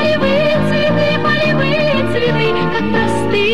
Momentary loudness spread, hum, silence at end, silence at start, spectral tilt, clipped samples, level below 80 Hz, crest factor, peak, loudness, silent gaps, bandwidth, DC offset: 2 LU; none; 0 s; 0 s; -6.5 dB/octave; under 0.1%; -38 dBFS; 10 dB; -2 dBFS; -14 LUFS; none; 13 kHz; 6%